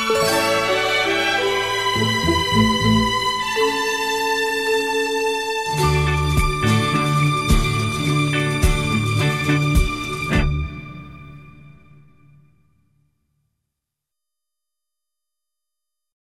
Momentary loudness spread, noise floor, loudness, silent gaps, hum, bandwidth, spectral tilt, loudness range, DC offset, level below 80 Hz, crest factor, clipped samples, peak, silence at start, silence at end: 4 LU; -85 dBFS; -19 LUFS; none; none; 16 kHz; -4.5 dB/octave; 7 LU; 0.3%; -30 dBFS; 18 dB; under 0.1%; -4 dBFS; 0 s; 4.7 s